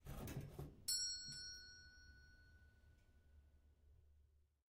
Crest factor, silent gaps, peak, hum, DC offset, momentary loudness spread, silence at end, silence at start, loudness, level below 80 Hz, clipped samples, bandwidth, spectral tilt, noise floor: 24 dB; none; -30 dBFS; none; under 0.1%; 24 LU; 0.3 s; 0 s; -47 LUFS; -66 dBFS; under 0.1%; 16 kHz; -2 dB/octave; -74 dBFS